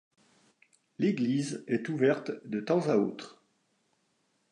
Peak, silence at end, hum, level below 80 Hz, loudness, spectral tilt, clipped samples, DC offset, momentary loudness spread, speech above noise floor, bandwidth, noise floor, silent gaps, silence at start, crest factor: -14 dBFS; 1.2 s; none; -80 dBFS; -30 LUFS; -6.5 dB/octave; under 0.1%; under 0.1%; 9 LU; 45 dB; 11 kHz; -74 dBFS; none; 1 s; 18 dB